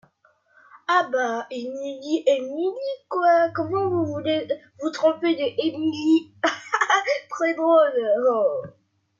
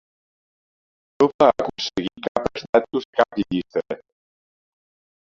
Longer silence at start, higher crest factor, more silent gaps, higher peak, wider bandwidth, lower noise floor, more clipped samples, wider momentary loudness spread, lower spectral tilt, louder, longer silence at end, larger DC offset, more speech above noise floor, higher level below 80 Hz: second, 0.75 s vs 1.2 s; second, 16 dB vs 22 dB; second, none vs 1.34-1.39 s, 2.28-2.35 s, 2.69-2.73 s, 3.05-3.13 s; second, -8 dBFS vs -2 dBFS; about the same, 7.6 kHz vs 7.6 kHz; second, -62 dBFS vs under -90 dBFS; neither; about the same, 12 LU vs 10 LU; about the same, -4.5 dB/octave vs -5.5 dB/octave; about the same, -23 LUFS vs -22 LUFS; second, 0.5 s vs 1.25 s; neither; second, 40 dB vs over 68 dB; second, -72 dBFS vs -54 dBFS